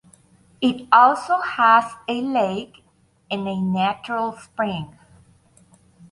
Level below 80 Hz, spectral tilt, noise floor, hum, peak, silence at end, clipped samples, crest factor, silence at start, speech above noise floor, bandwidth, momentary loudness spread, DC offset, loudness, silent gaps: -60 dBFS; -6 dB/octave; -55 dBFS; none; -2 dBFS; 1.25 s; under 0.1%; 20 dB; 0.6 s; 35 dB; 11.5 kHz; 15 LU; under 0.1%; -20 LUFS; none